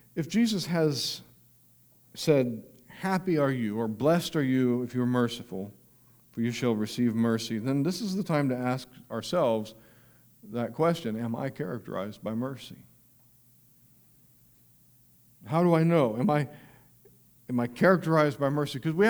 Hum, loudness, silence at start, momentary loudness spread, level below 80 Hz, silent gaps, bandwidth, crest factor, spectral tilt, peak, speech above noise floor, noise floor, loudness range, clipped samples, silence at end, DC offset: none; -28 LUFS; 0.15 s; 13 LU; -68 dBFS; none; over 20 kHz; 20 dB; -6.5 dB/octave; -8 dBFS; 33 dB; -60 dBFS; 9 LU; under 0.1%; 0 s; under 0.1%